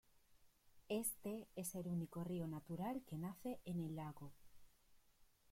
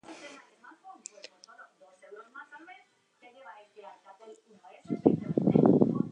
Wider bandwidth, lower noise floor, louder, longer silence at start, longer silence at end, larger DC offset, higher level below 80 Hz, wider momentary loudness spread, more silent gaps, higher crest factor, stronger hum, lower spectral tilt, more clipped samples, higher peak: first, 16.5 kHz vs 9.2 kHz; first, -72 dBFS vs -62 dBFS; second, -47 LUFS vs -26 LUFS; about the same, 0.15 s vs 0.1 s; first, 0.3 s vs 0 s; neither; second, -74 dBFS vs -68 dBFS; second, 7 LU vs 28 LU; neither; second, 20 dB vs 26 dB; neither; second, -6 dB/octave vs -8 dB/octave; neither; second, -30 dBFS vs -6 dBFS